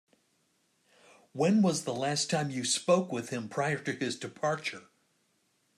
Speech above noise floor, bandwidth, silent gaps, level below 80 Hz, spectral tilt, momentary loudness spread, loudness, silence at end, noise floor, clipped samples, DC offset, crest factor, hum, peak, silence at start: 43 dB; 13 kHz; none; -78 dBFS; -4.5 dB/octave; 10 LU; -30 LUFS; 0.95 s; -73 dBFS; under 0.1%; under 0.1%; 20 dB; none; -12 dBFS; 1.35 s